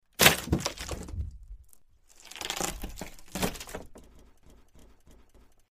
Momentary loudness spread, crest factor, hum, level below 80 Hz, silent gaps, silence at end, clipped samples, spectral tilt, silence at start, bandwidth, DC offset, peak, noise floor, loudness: 24 LU; 30 dB; none; -46 dBFS; none; 0.6 s; under 0.1%; -2.5 dB/octave; 0.2 s; 15.5 kHz; under 0.1%; -2 dBFS; -57 dBFS; -29 LUFS